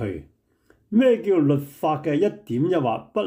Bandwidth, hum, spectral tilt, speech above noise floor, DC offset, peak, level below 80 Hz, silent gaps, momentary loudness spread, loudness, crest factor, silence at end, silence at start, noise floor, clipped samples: 16 kHz; none; -8 dB/octave; 40 dB; under 0.1%; -8 dBFS; -60 dBFS; none; 7 LU; -22 LUFS; 14 dB; 0 s; 0 s; -61 dBFS; under 0.1%